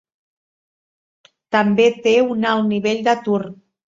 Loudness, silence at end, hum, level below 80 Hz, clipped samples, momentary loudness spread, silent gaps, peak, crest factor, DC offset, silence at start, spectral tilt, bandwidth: -17 LUFS; 0.35 s; none; -64 dBFS; under 0.1%; 7 LU; none; 0 dBFS; 18 dB; under 0.1%; 1.5 s; -5.5 dB/octave; 7.6 kHz